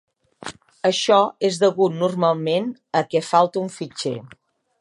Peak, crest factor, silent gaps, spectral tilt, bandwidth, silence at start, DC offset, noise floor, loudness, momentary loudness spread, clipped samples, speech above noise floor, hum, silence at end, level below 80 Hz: -2 dBFS; 18 dB; none; -5 dB/octave; 11.5 kHz; 0.4 s; under 0.1%; -39 dBFS; -20 LUFS; 17 LU; under 0.1%; 19 dB; none; 0.55 s; -70 dBFS